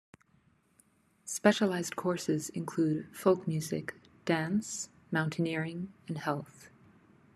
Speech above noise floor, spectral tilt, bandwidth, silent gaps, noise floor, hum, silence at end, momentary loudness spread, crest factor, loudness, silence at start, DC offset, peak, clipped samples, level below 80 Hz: 37 dB; -5 dB/octave; 13.5 kHz; none; -68 dBFS; none; 0.7 s; 12 LU; 24 dB; -33 LUFS; 1.25 s; under 0.1%; -10 dBFS; under 0.1%; -74 dBFS